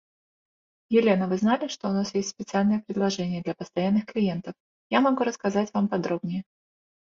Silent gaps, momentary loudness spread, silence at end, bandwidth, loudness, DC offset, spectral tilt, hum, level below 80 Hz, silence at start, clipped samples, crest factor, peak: 4.60-4.90 s; 8 LU; 0.7 s; 7.4 kHz; -26 LUFS; under 0.1%; -6 dB/octave; none; -66 dBFS; 0.9 s; under 0.1%; 18 dB; -8 dBFS